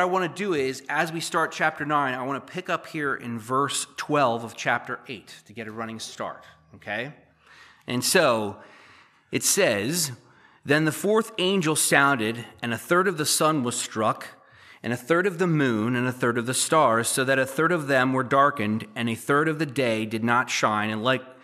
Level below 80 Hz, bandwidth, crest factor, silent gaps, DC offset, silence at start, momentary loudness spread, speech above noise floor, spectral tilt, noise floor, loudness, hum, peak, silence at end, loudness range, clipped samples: -74 dBFS; 15 kHz; 22 dB; none; under 0.1%; 0 s; 13 LU; 30 dB; -3.5 dB/octave; -54 dBFS; -24 LUFS; none; -2 dBFS; 0.1 s; 5 LU; under 0.1%